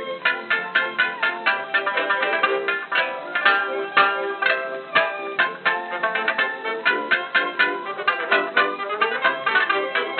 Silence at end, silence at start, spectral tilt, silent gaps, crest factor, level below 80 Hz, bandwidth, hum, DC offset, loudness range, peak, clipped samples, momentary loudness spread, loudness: 0 s; 0 s; 1.5 dB/octave; none; 20 dB; under -90 dBFS; 4.7 kHz; none; under 0.1%; 1 LU; -2 dBFS; under 0.1%; 5 LU; -21 LUFS